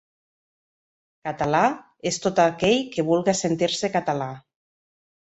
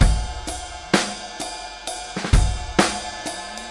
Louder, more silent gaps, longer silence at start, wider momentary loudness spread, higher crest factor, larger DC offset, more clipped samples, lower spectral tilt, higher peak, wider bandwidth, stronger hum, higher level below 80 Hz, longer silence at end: about the same, -23 LUFS vs -24 LUFS; neither; first, 1.25 s vs 0 s; about the same, 12 LU vs 10 LU; about the same, 20 dB vs 22 dB; neither; neither; about the same, -4.5 dB/octave vs -4 dB/octave; second, -4 dBFS vs 0 dBFS; second, 8.4 kHz vs 11.5 kHz; neither; second, -58 dBFS vs -26 dBFS; first, 0.85 s vs 0 s